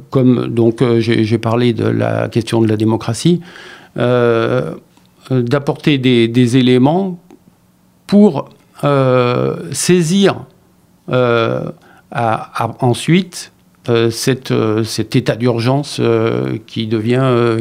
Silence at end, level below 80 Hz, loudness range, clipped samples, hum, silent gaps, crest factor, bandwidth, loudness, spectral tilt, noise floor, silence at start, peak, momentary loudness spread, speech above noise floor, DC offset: 0 s; -52 dBFS; 3 LU; under 0.1%; none; none; 14 dB; 16 kHz; -14 LUFS; -6 dB/octave; -52 dBFS; 0 s; 0 dBFS; 10 LU; 38 dB; under 0.1%